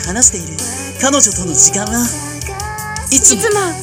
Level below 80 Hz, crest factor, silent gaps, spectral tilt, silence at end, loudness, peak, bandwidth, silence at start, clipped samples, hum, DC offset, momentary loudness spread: -34 dBFS; 14 dB; none; -2 dB/octave; 0 s; -11 LUFS; 0 dBFS; over 20 kHz; 0 s; 0.4%; none; under 0.1%; 14 LU